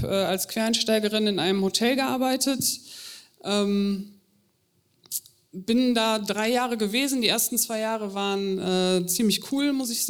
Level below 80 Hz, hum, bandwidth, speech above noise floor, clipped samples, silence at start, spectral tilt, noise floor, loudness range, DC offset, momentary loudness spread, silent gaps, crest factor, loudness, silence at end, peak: -62 dBFS; none; over 20 kHz; 44 dB; under 0.1%; 0 s; -3.5 dB/octave; -68 dBFS; 4 LU; under 0.1%; 11 LU; none; 18 dB; -24 LUFS; 0 s; -6 dBFS